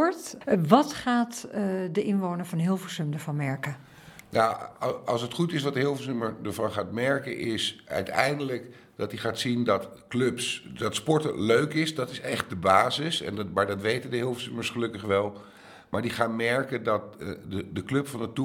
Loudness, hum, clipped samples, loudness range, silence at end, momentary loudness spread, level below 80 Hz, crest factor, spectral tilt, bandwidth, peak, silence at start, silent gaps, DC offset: -28 LUFS; none; under 0.1%; 3 LU; 0 s; 10 LU; -66 dBFS; 26 dB; -5 dB/octave; 17.5 kHz; -2 dBFS; 0 s; none; under 0.1%